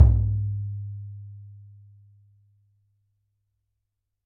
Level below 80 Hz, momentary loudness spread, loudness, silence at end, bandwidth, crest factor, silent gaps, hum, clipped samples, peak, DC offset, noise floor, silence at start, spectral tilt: -32 dBFS; 25 LU; -27 LUFS; 2.7 s; 1.6 kHz; 24 dB; none; none; under 0.1%; -2 dBFS; under 0.1%; -81 dBFS; 0 s; -13 dB/octave